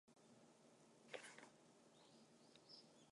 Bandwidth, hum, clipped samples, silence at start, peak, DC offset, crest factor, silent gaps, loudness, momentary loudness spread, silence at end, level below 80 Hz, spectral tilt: 11 kHz; none; under 0.1%; 0.05 s; -34 dBFS; under 0.1%; 32 dB; none; -63 LUFS; 12 LU; 0 s; under -90 dBFS; -2.5 dB/octave